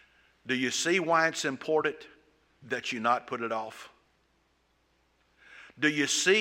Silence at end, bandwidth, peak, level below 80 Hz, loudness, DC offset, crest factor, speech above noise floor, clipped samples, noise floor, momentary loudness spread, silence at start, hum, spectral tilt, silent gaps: 0 s; 16 kHz; -10 dBFS; -76 dBFS; -28 LUFS; under 0.1%; 22 dB; 42 dB; under 0.1%; -71 dBFS; 13 LU; 0.45 s; none; -2.5 dB/octave; none